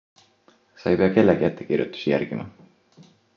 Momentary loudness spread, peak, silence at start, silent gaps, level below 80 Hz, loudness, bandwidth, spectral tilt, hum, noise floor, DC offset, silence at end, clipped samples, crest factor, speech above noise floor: 14 LU; -4 dBFS; 0.8 s; none; -54 dBFS; -22 LUFS; 7 kHz; -8.5 dB/octave; none; -60 dBFS; under 0.1%; 0.85 s; under 0.1%; 20 dB; 38 dB